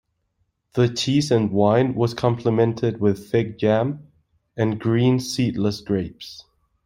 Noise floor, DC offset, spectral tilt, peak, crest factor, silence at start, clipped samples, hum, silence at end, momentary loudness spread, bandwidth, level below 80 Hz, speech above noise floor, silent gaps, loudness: -71 dBFS; under 0.1%; -6.5 dB/octave; -4 dBFS; 18 dB; 0.75 s; under 0.1%; none; 0.45 s; 10 LU; 16 kHz; -54 dBFS; 51 dB; none; -21 LUFS